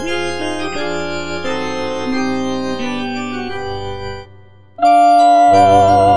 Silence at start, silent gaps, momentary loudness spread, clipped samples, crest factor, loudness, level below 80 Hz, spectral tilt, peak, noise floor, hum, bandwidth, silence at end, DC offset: 0 s; none; 15 LU; under 0.1%; 14 dB; -15 LUFS; -44 dBFS; -5 dB/octave; 0 dBFS; -43 dBFS; none; 10 kHz; 0 s; 4%